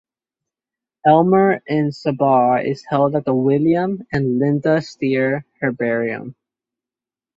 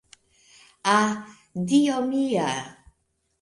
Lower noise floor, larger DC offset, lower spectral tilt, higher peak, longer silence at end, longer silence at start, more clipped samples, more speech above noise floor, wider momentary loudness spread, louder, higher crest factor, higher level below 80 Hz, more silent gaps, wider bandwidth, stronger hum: first, -90 dBFS vs -73 dBFS; neither; first, -8.5 dB/octave vs -4.5 dB/octave; first, -2 dBFS vs -8 dBFS; first, 1.05 s vs 0.7 s; first, 1.05 s vs 0.85 s; neither; first, 73 dB vs 50 dB; second, 7 LU vs 14 LU; first, -18 LUFS vs -24 LUFS; about the same, 18 dB vs 18 dB; first, -56 dBFS vs -66 dBFS; neither; second, 7.8 kHz vs 11.5 kHz; neither